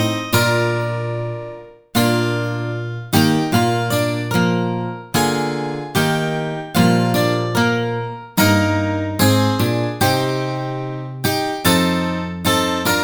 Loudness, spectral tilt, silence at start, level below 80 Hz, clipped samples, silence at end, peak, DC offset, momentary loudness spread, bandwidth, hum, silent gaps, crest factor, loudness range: -18 LUFS; -5 dB/octave; 0 s; -48 dBFS; under 0.1%; 0 s; 0 dBFS; under 0.1%; 9 LU; over 20 kHz; none; none; 18 dB; 2 LU